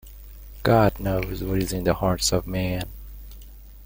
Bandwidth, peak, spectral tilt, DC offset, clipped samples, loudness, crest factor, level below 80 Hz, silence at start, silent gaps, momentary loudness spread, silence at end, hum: 17 kHz; -4 dBFS; -5 dB/octave; under 0.1%; under 0.1%; -24 LUFS; 20 dB; -38 dBFS; 0.05 s; none; 24 LU; 0 s; none